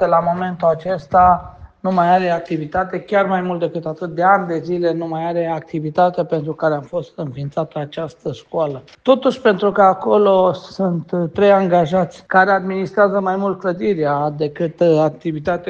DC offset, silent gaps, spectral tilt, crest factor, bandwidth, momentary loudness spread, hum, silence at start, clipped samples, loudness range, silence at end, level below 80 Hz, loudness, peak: under 0.1%; none; -7.5 dB/octave; 16 dB; 7.6 kHz; 11 LU; none; 0 s; under 0.1%; 6 LU; 0 s; -50 dBFS; -17 LUFS; 0 dBFS